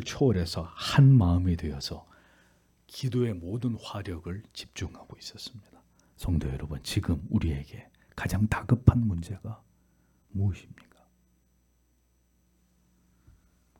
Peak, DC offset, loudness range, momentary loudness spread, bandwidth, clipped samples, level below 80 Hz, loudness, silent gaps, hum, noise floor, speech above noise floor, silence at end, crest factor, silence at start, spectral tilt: -4 dBFS; under 0.1%; 13 LU; 21 LU; 15.5 kHz; under 0.1%; -46 dBFS; -28 LUFS; none; none; -68 dBFS; 41 dB; 3.2 s; 26 dB; 0 s; -7 dB/octave